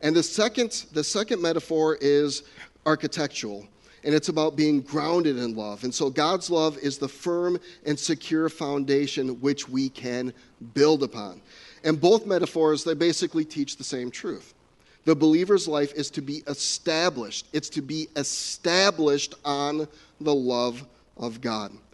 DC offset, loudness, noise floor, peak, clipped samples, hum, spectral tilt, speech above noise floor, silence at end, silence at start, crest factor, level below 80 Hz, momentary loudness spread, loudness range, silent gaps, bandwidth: under 0.1%; -25 LUFS; -59 dBFS; -6 dBFS; under 0.1%; none; -4 dB/octave; 34 dB; 0.15 s; 0 s; 20 dB; -66 dBFS; 11 LU; 2 LU; none; 11.5 kHz